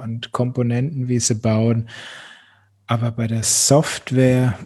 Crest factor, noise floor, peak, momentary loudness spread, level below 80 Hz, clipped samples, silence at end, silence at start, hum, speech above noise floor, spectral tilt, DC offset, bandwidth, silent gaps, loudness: 18 dB; -54 dBFS; 0 dBFS; 13 LU; -52 dBFS; under 0.1%; 0 s; 0 s; none; 35 dB; -5 dB/octave; under 0.1%; 13 kHz; none; -19 LUFS